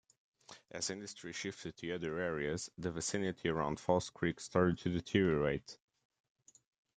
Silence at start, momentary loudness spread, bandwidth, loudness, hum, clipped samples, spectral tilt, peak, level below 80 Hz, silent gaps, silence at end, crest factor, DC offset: 0.5 s; 12 LU; 9.6 kHz; -37 LUFS; none; under 0.1%; -5 dB/octave; -16 dBFS; -64 dBFS; none; 1.2 s; 22 dB; under 0.1%